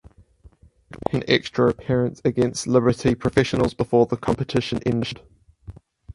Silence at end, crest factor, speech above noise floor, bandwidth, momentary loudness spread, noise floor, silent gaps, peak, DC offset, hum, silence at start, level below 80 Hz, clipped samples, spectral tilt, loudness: 0.45 s; 22 dB; 31 dB; 11.5 kHz; 7 LU; -52 dBFS; none; -2 dBFS; under 0.1%; none; 0.95 s; -46 dBFS; under 0.1%; -6 dB/octave; -22 LUFS